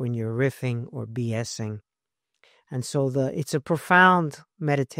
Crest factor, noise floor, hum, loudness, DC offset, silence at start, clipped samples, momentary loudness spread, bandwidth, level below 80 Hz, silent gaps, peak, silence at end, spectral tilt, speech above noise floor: 22 dB; -85 dBFS; none; -24 LUFS; under 0.1%; 0 s; under 0.1%; 16 LU; 16 kHz; -64 dBFS; none; -4 dBFS; 0 s; -5.5 dB/octave; 61 dB